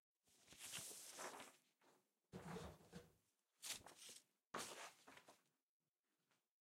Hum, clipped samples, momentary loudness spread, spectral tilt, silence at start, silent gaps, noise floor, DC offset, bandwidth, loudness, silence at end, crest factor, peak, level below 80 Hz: none; under 0.1%; 12 LU; -2 dB/octave; 0.25 s; none; under -90 dBFS; under 0.1%; 16 kHz; -56 LUFS; 1.2 s; 24 dB; -36 dBFS; -82 dBFS